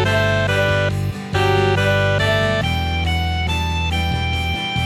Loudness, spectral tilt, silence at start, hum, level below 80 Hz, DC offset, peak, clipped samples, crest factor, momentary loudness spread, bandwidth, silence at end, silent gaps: -18 LUFS; -5.5 dB/octave; 0 s; none; -30 dBFS; under 0.1%; -4 dBFS; under 0.1%; 14 dB; 4 LU; 16 kHz; 0 s; none